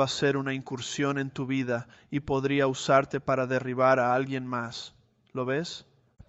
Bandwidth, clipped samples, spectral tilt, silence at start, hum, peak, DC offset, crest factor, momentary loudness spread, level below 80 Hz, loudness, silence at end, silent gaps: 8.2 kHz; under 0.1%; -5.5 dB/octave; 0 s; none; -8 dBFS; under 0.1%; 20 dB; 12 LU; -60 dBFS; -28 LUFS; 0.45 s; none